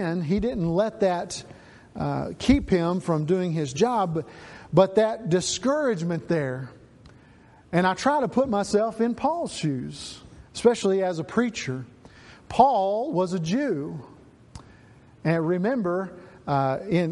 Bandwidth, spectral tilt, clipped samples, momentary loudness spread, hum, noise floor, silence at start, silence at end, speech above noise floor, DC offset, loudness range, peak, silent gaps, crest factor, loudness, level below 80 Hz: 11.5 kHz; -6 dB/octave; under 0.1%; 15 LU; none; -53 dBFS; 0 s; 0 s; 29 dB; under 0.1%; 3 LU; -4 dBFS; none; 20 dB; -25 LUFS; -48 dBFS